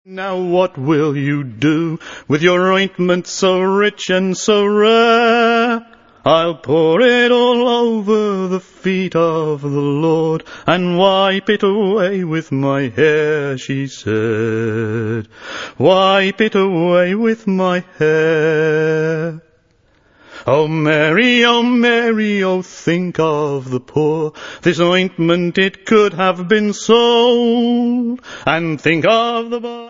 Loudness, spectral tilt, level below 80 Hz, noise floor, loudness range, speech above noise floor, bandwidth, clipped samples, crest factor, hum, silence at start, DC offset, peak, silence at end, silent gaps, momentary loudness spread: -15 LUFS; -5.5 dB/octave; -58 dBFS; -55 dBFS; 3 LU; 41 dB; 7.6 kHz; under 0.1%; 14 dB; none; 0.1 s; under 0.1%; 0 dBFS; 0 s; none; 9 LU